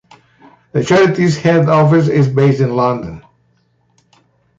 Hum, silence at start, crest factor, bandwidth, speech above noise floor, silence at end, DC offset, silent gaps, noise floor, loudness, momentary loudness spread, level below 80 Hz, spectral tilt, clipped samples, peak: none; 0.75 s; 12 dB; 7.8 kHz; 46 dB; 1.4 s; under 0.1%; none; -58 dBFS; -13 LUFS; 10 LU; -50 dBFS; -7.5 dB/octave; under 0.1%; -2 dBFS